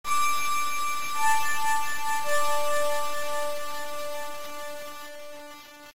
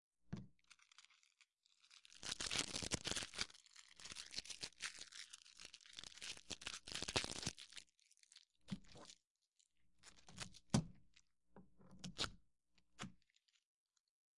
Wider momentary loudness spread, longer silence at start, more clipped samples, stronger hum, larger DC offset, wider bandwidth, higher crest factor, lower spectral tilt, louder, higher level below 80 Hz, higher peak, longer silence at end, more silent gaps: second, 16 LU vs 24 LU; about the same, 0.05 s vs 0.1 s; neither; neither; first, 5% vs under 0.1%; first, 16 kHz vs 11.5 kHz; second, 12 dB vs 34 dB; second, -1 dB/octave vs -2.5 dB/octave; first, -28 LUFS vs -47 LUFS; first, -56 dBFS vs -70 dBFS; first, -14 dBFS vs -18 dBFS; second, 0.05 s vs 0.2 s; second, none vs 9.30-9.35 s, 13.65-13.86 s, 14.00-14.04 s